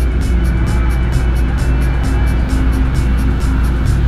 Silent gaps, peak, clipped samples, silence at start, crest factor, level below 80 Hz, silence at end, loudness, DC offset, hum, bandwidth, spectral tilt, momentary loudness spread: none; -2 dBFS; under 0.1%; 0 s; 10 dB; -14 dBFS; 0 s; -16 LUFS; 0.2%; none; 12.5 kHz; -7 dB/octave; 1 LU